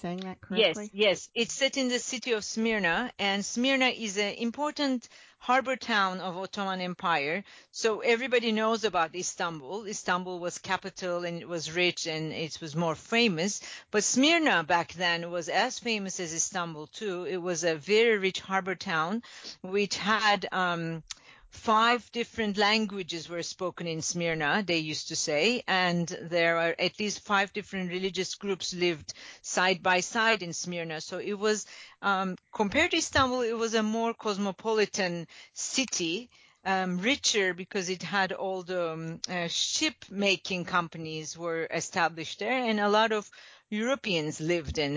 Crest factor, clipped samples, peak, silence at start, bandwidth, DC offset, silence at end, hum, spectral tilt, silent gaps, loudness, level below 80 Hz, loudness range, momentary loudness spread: 18 dB; under 0.1%; -10 dBFS; 0.05 s; 8 kHz; under 0.1%; 0 s; none; -3 dB/octave; none; -29 LUFS; -60 dBFS; 3 LU; 11 LU